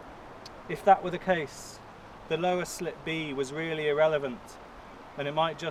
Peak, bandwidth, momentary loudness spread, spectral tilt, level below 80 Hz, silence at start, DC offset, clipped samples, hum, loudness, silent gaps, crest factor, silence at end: -8 dBFS; 16 kHz; 22 LU; -4.5 dB/octave; -58 dBFS; 0 s; under 0.1%; under 0.1%; none; -29 LUFS; none; 22 dB; 0 s